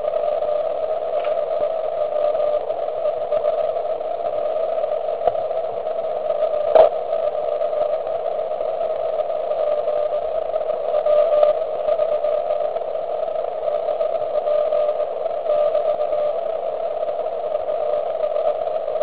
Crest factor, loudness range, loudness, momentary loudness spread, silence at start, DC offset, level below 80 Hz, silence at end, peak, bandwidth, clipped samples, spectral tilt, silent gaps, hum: 20 dB; 2 LU; -21 LUFS; 7 LU; 0 s; 1%; -58 dBFS; 0 s; 0 dBFS; 4.7 kHz; under 0.1%; -8 dB/octave; none; none